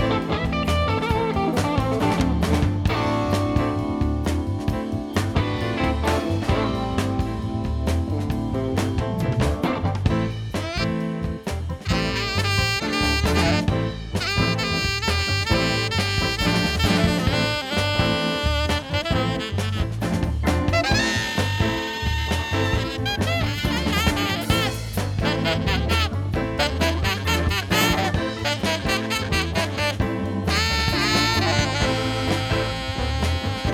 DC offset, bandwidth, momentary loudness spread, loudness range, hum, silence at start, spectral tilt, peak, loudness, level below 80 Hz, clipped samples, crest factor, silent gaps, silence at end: under 0.1%; 18.5 kHz; 5 LU; 3 LU; none; 0 s; -5 dB/octave; -4 dBFS; -22 LUFS; -34 dBFS; under 0.1%; 18 dB; none; 0 s